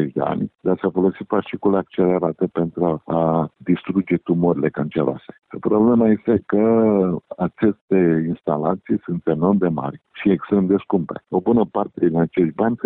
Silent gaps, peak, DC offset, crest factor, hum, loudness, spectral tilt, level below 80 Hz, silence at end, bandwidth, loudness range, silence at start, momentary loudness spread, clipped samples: 7.81-7.88 s; -4 dBFS; under 0.1%; 16 dB; none; -20 LUFS; -12.5 dB/octave; -54 dBFS; 0 s; 4 kHz; 3 LU; 0 s; 7 LU; under 0.1%